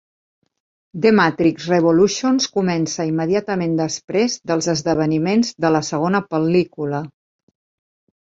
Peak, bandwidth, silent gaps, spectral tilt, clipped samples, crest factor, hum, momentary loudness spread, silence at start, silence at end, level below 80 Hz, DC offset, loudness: -2 dBFS; 7.8 kHz; 4.04-4.08 s; -5 dB/octave; under 0.1%; 18 dB; none; 7 LU; 0.95 s; 1.2 s; -58 dBFS; under 0.1%; -18 LUFS